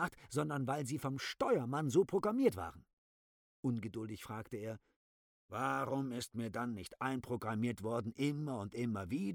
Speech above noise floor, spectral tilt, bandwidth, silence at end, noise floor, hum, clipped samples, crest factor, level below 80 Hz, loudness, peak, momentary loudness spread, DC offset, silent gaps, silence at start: over 52 dB; -6 dB/octave; 19.5 kHz; 0 s; under -90 dBFS; none; under 0.1%; 20 dB; -70 dBFS; -39 LUFS; -18 dBFS; 12 LU; under 0.1%; 2.93-3.63 s, 4.96-5.49 s; 0 s